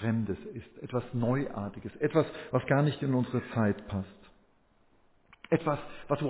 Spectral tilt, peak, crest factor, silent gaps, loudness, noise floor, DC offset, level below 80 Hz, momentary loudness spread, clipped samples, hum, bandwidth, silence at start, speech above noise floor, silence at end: -7 dB/octave; -12 dBFS; 18 dB; none; -31 LUFS; -66 dBFS; under 0.1%; -58 dBFS; 11 LU; under 0.1%; none; 4 kHz; 0 s; 35 dB; 0 s